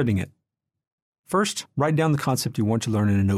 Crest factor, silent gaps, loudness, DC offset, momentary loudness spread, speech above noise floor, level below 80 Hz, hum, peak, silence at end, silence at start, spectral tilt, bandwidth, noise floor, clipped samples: 14 dB; 0.87-1.13 s, 1.19-1.23 s; -24 LUFS; under 0.1%; 5 LU; 60 dB; -56 dBFS; none; -8 dBFS; 0 s; 0 s; -6 dB/octave; 15 kHz; -82 dBFS; under 0.1%